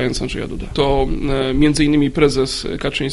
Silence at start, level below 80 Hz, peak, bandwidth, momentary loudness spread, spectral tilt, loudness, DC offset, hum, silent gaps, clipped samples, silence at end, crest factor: 0 s; -28 dBFS; 0 dBFS; 11.5 kHz; 9 LU; -5.5 dB/octave; -18 LUFS; under 0.1%; none; none; under 0.1%; 0 s; 16 dB